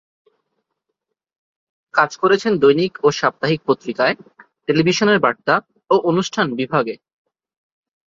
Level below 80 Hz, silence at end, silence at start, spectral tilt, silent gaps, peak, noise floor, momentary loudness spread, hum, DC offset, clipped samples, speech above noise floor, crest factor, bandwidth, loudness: -60 dBFS; 1.25 s; 1.95 s; -5 dB/octave; none; -2 dBFS; -78 dBFS; 6 LU; none; under 0.1%; under 0.1%; 61 dB; 18 dB; 7.6 kHz; -18 LUFS